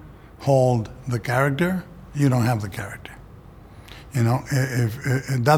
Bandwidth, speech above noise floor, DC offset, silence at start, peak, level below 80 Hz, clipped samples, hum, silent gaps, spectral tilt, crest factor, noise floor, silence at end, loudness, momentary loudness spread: 16.5 kHz; 23 dB; under 0.1%; 0 s; -2 dBFS; -48 dBFS; under 0.1%; none; none; -6.5 dB/octave; 20 dB; -44 dBFS; 0 s; -23 LUFS; 15 LU